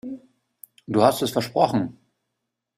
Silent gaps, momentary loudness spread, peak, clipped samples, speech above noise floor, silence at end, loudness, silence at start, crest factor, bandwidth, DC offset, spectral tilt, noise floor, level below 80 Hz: none; 16 LU; -2 dBFS; under 0.1%; 60 dB; 0.85 s; -22 LUFS; 0.05 s; 22 dB; 16 kHz; under 0.1%; -5.5 dB/octave; -81 dBFS; -62 dBFS